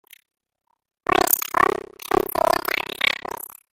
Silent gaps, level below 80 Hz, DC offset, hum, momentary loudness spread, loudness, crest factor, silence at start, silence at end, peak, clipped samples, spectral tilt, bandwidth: none; -52 dBFS; under 0.1%; none; 12 LU; -21 LUFS; 22 dB; 1.1 s; 0.25 s; 0 dBFS; under 0.1%; -2 dB/octave; 17 kHz